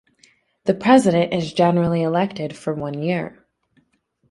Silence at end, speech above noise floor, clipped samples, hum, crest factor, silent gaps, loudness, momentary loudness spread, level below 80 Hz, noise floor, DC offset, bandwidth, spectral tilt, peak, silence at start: 1 s; 47 dB; under 0.1%; none; 18 dB; none; -19 LUFS; 12 LU; -58 dBFS; -66 dBFS; under 0.1%; 11.5 kHz; -6.5 dB/octave; -2 dBFS; 0.65 s